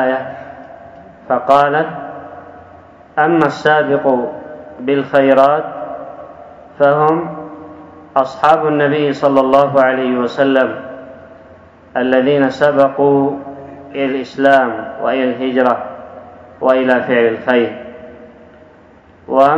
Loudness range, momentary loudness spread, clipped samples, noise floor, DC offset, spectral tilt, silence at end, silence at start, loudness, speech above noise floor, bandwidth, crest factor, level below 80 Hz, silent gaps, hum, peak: 3 LU; 21 LU; 0.2%; -44 dBFS; under 0.1%; -7 dB/octave; 0 s; 0 s; -14 LUFS; 31 dB; 7.8 kHz; 14 dB; -58 dBFS; none; none; 0 dBFS